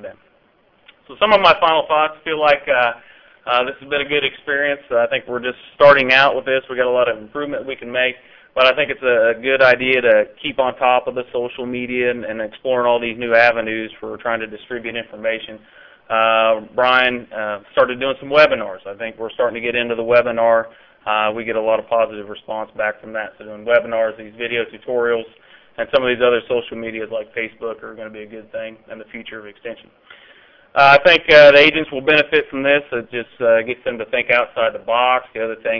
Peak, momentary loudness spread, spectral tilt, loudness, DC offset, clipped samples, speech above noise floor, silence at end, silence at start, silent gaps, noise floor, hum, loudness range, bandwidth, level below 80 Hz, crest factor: -2 dBFS; 17 LU; -5 dB/octave; -16 LUFS; under 0.1%; under 0.1%; 40 dB; 0 s; 0 s; none; -57 dBFS; none; 9 LU; 5.4 kHz; -54 dBFS; 16 dB